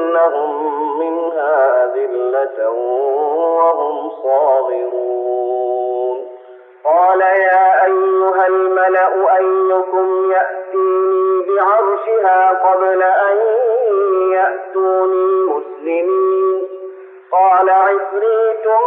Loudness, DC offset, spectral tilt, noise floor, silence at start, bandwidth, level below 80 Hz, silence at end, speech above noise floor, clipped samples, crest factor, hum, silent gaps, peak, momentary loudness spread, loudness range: -14 LUFS; under 0.1%; -0.5 dB/octave; -39 dBFS; 0 s; 3.6 kHz; -84 dBFS; 0 s; 25 dB; under 0.1%; 12 dB; none; none; -2 dBFS; 7 LU; 4 LU